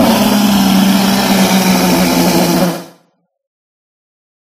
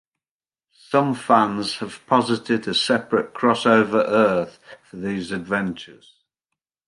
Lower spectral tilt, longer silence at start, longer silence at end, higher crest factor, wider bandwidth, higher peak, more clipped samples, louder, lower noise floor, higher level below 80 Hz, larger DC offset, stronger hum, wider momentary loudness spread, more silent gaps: about the same, -4.5 dB/octave vs -5 dB/octave; second, 0 s vs 0.9 s; first, 1.55 s vs 0.95 s; second, 12 dB vs 20 dB; first, 15.5 kHz vs 11.5 kHz; about the same, 0 dBFS vs -2 dBFS; neither; first, -10 LUFS vs -20 LUFS; second, -57 dBFS vs under -90 dBFS; first, -40 dBFS vs -62 dBFS; neither; neither; second, 3 LU vs 12 LU; neither